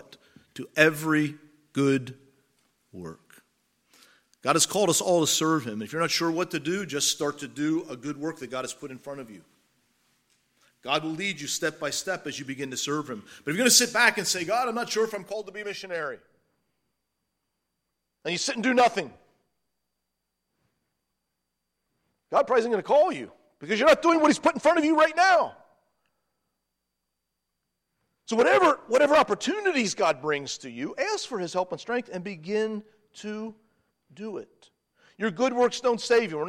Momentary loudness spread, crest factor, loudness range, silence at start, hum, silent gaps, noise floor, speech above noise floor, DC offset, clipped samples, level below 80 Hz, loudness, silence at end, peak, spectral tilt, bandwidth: 17 LU; 24 dB; 11 LU; 0.55 s; none; none; -82 dBFS; 57 dB; under 0.1%; under 0.1%; -70 dBFS; -25 LUFS; 0 s; -2 dBFS; -3 dB/octave; 16.5 kHz